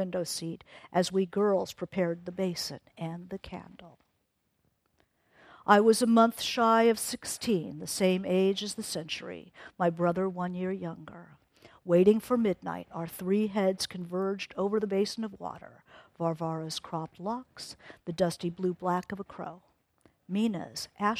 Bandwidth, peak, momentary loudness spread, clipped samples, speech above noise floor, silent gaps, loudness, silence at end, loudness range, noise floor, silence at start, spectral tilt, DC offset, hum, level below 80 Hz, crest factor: 15.5 kHz; -6 dBFS; 18 LU; under 0.1%; 47 dB; none; -29 LUFS; 0 s; 9 LU; -77 dBFS; 0 s; -5 dB/octave; under 0.1%; none; -68 dBFS; 24 dB